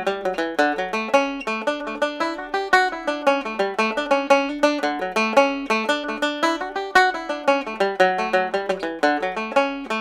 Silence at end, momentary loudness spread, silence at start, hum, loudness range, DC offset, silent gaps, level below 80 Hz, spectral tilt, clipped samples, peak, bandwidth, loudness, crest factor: 0 s; 7 LU; 0 s; none; 2 LU; under 0.1%; none; -56 dBFS; -3.5 dB/octave; under 0.1%; -2 dBFS; 15 kHz; -21 LUFS; 18 dB